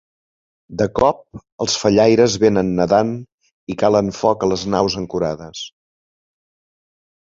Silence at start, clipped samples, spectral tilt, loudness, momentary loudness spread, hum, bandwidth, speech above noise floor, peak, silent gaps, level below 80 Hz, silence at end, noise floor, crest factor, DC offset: 0.7 s; under 0.1%; -5 dB/octave; -17 LUFS; 17 LU; none; 7.8 kHz; over 73 dB; -2 dBFS; 1.52-1.58 s, 3.34-3.38 s, 3.53-3.67 s; -46 dBFS; 1.6 s; under -90 dBFS; 18 dB; under 0.1%